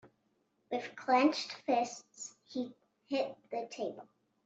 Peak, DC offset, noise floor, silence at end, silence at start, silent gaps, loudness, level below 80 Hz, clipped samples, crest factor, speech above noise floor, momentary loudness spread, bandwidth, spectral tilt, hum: -16 dBFS; under 0.1%; -77 dBFS; 0.4 s; 0.05 s; none; -35 LUFS; -84 dBFS; under 0.1%; 20 dB; 42 dB; 17 LU; 8.2 kHz; -3 dB/octave; none